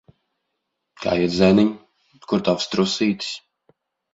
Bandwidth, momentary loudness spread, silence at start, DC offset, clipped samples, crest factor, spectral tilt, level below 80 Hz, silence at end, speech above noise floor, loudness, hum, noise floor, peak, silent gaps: 8 kHz; 14 LU; 1 s; under 0.1%; under 0.1%; 20 dB; -5.5 dB/octave; -52 dBFS; 0.75 s; 58 dB; -20 LUFS; none; -77 dBFS; -2 dBFS; none